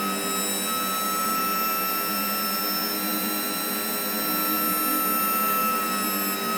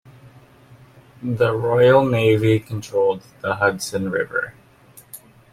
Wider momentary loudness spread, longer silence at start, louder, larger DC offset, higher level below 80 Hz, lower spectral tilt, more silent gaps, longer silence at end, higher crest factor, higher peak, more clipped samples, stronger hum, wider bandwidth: second, 3 LU vs 19 LU; second, 0 s vs 0.25 s; second, -23 LUFS vs -19 LUFS; neither; second, -74 dBFS vs -54 dBFS; second, -2 dB/octave vs -6 dB/octave; neither; second, 0 s vs 0.35 s; second, 12 dB vs 18 dB; second, -12 dBFS vs -2 dBFS; neither; neither; first, over 20 kHz vs 16 kHz